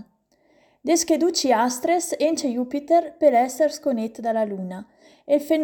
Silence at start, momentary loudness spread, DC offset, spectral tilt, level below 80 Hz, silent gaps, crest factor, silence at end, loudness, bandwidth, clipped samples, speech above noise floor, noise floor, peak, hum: 0.85 s; 9 LU; under 0.1%; -3.5 dB/octave; -68 dBFS; none; 16 dB; 0 s; -22 LUFS; 19 kHz; under 0.1%; 41 dB; -62 dBFS; -6 dBFS; none